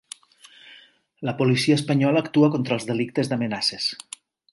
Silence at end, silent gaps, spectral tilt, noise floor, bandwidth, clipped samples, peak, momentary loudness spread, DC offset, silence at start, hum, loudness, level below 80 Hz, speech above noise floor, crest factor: 0.55 s; none; -5.5 dB/octave; -52 dBFS; 11.5 kHz; under 0.1%; -6 dBFS; 20 LU; under 0.1%; 0.65 s; none; -22 LUFS; -66 dBFS; 31 dB; 16 dB